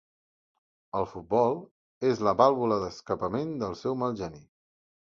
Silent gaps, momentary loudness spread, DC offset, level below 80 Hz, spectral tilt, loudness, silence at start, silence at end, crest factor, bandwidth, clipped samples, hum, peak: 1.71-2.01 s; 12 LU; under 0.1%; -60 dBFS; -7 dB/octave; -28 LUFS; 0.95 s; 0.6 s; 22 dB; 7.4 kHz; under 0.1%; none; -8 dBFS